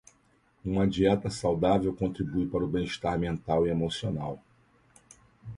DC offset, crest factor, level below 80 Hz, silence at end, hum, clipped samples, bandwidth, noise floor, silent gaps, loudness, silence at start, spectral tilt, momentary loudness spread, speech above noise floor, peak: under 0.1%; 18 dB; -48 dBFS; 0 s; none; under 0.1%; 11.5 kHz; -66 dBFS; none; -29 LUFS; 0.65 s; -7 dB/octave; 10 LU; 38 dB; -12 dBFS